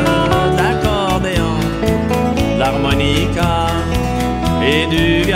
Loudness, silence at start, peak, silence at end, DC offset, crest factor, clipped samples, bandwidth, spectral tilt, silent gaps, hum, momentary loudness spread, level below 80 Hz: -15 LUFS; 0 s; -2 dBFS; 0 s; under 0.1%; 14 dB; under 0.1%; 16 kHz; -5.5 dB/octave; none; none; 4 LU; -26 dBFS